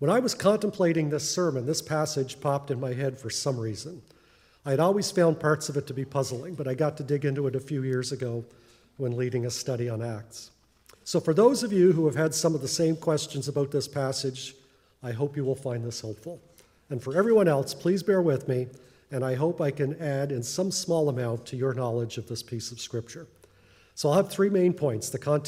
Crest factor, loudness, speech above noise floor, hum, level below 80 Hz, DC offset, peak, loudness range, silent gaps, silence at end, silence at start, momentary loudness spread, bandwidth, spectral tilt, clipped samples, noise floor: 20 dB; -27 LUFS; 33 dB; none; -68 dBFS; under 0.1%; -8 dBFS; 6 LU; none; 0 s; 0 s; 13 LU; 16 kHz; -5.5 dB/octave; under 0.1%; -60 dBFS